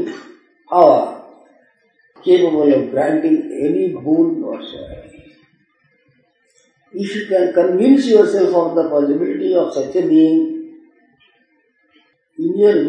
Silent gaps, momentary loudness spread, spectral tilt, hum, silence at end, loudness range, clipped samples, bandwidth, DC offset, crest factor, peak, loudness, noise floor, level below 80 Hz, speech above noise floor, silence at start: none; 16 LU; -7 dB/octave; none; 0 s; 8 LU; under 0.1%; 9.4 kHz; under 0.1%; 16 dB; 0 dBFS; -15 LUFS; -60 dBFS; -56 dBFS; 46 dB; 0 s